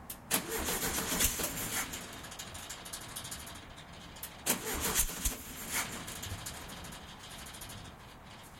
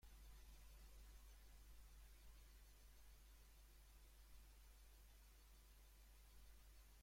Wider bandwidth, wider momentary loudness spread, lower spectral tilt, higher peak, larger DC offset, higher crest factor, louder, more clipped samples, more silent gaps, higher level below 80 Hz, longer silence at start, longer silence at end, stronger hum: about the same, 16.5 kHz vs 16.5 kHz; first, 17 LU vs 3 LU; about the same, -2 dB/octave vs -3 dB/octave; first, -12 dBFS vs -52 dBFS; neither; first, 26 dB vs 12 dB; first, -35 LUFS vs -68 LUFS; neither; neither; first, -50 dBFS vs -66 dBFS; about the same, 0 s vs 0 s; about the same, 0 s vs 0 s; neither